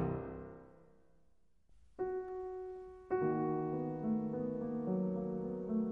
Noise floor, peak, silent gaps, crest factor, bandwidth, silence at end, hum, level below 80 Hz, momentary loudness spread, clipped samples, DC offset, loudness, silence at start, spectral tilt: -74 dBFS; -24 dBFS; none; 14 dB; 3.2 kHz; 0 s; none; -62 dBFS; 12 LU; under 0.1%; under 0.1%; -39 LUFS; 0 s; -11.5 dB/octave